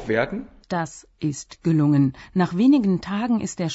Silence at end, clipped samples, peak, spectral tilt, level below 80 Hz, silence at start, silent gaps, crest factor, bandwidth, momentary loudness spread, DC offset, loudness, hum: 0 s; under 0.1%; -8 dBFS; -6.5 dB/octave; -52 dBFS; 0 s; none; 14 dB; 8 kHz; 12 LU; under 0.1%; -22 LUFS; none